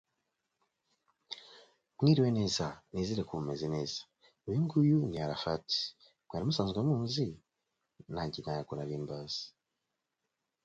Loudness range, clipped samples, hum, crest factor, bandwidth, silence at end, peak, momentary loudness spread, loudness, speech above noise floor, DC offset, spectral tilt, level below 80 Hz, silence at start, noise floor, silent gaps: 5 LU; under 0.1%; none; 20 dB; 7.8 kHz; 1.15 s; -14 dBFS; 15 LU; -34 LUFS; 54 dB; under 0.1%; -6.5 dB/octave; -62 dBFS; 1.3 s; -86 dBFS; none